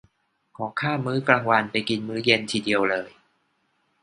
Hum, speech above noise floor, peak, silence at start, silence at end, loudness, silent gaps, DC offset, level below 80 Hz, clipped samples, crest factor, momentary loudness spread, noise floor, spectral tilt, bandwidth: none; 46 dB; 0 dBFS; 0.6 s; 0.95 s; -23 LUFS; none; under 0.1%; -64 dBFS; under 0.1%; 24 dB; 10 LU; -70 dBFS; -5 dB/octave; 11 kHz